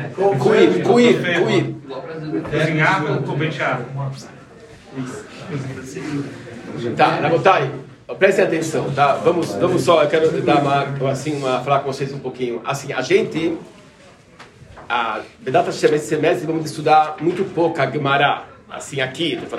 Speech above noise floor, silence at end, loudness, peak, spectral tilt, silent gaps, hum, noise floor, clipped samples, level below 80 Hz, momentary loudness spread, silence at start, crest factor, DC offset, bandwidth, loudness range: 28 dB; 0 s; -18 LUFS; 0 dBFS; -5.5 dB/octave; none; none; -46 dBFS; under 0.1%; -58 dBFS; 15 LU; 0 s; 18 dB; under 0.1%; 13 kHz; 7 LU